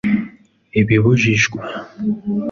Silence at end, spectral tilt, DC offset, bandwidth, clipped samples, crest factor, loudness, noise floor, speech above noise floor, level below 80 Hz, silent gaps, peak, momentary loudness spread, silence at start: 0 s; -6 dB/octave; under 0.1%; 7.4 kHz; under 0.1%; 14 dB; -17 LUFS; -39 dBFS; 22 dB; -46 dBFS; none; -2 dBFS; 14 LU; 0.05 s